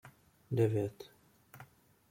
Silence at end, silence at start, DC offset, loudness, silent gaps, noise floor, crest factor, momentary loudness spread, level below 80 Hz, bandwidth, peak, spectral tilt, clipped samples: 0.45 s; 0.05 s; under 0.1%; -34 LUFS; none; -59 dBFS; 20 dB; 24 LU; -72 dBFS; 16.5 kHz; -18 dBFS; -8.5 dB/octave; under 0.1%